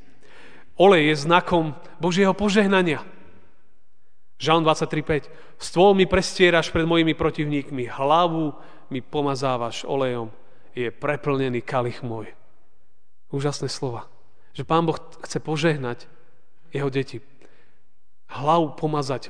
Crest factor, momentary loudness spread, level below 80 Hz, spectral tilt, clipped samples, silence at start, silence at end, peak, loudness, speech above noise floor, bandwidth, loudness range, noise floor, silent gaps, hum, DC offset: 22 dB; 16 LU; -48 dBFS; -5.5 dB/octave; under 0.1%; 0.8 s; 0 s; -2 dBFS; -22 LUFS; 48 dB; 10 kHz; 9 LU; -70 dBFS; none; none; 2%